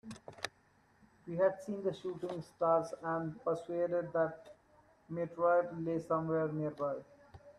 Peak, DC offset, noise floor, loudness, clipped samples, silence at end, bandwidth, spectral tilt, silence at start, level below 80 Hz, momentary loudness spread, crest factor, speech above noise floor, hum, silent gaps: -16 dBFS; under 0.1%; -69 dBFS; -36 LUFS; under 0.1%; 0.05 s; 12 kHz; -7 dB/octave; 0.05 s; -74 dBFS; 13 LU; 20 dB; 34 dB; none; none